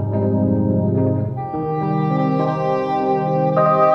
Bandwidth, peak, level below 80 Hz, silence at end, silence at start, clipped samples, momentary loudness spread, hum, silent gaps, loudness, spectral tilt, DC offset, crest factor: 6.2 kHz; -4 dBFS; -48 dBFS; 0 s; 0 s; under 0.1%; 6 LU; none; none; -19 LUFS; -10.5 dB/octave; under 0.1%; 14 dB